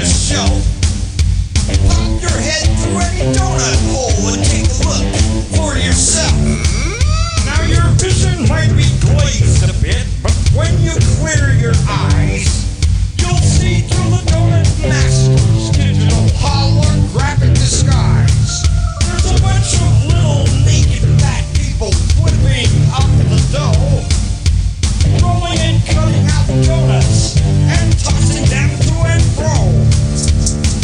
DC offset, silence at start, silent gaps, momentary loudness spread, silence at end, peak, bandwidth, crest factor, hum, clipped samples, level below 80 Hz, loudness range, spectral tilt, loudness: under 0.1%; 0 s; none; 4 LU; 0 s; 0 dBFS; 10.5 kHz; 12 dB; none; under 0.1%; -16 dBFS; 2 LU; -5 dB/octave; -13 LUFS